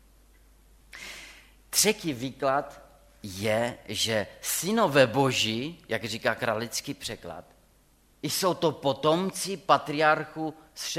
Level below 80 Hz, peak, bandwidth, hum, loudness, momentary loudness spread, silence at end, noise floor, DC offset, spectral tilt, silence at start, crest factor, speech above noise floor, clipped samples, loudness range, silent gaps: -60 dBFS; -4 dBFS; 16 kHz; none; -27 LUFS; 18 LU; 0 s; -62 dBFS; under 0.1%; -3.5 dB/octave; 0.95 s; 24 dB; 34 dB; under 0.1%; 4 LU; none